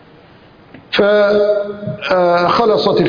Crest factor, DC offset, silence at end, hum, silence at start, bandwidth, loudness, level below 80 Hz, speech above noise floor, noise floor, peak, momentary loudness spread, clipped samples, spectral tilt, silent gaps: 14 dB; under 0.1%; 0 s; none; 0.75 s; 5.2 kHz; -14 LUFS; -50 dBFS; 30 dB; -43 dBFS; 0 dBFS; 8 LU; under 0.1%; -6.5 dB/octave; none